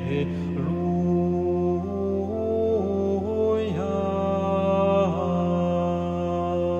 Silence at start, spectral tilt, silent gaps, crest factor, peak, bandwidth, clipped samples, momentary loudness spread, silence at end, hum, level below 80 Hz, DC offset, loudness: 0 s; -9 dB/octave; none; 14 dB; -10 dBFS; 7 kHz; under 0.1%; 5 LU; 0 s; none; -52 dBFS; under 0.1%; -25 LUFS